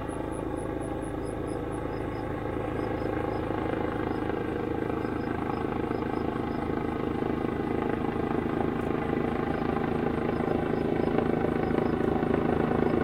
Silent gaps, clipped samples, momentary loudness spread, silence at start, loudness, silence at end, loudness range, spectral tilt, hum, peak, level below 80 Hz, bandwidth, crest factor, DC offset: none; under 0.1%; 6 LU; 0 s; -30 LUFS; 0 s; 4 LU; -8 dB/octave; none; -10 dBFS; -44 dBFS; 15.5 kHz; 18 dB; 0.1%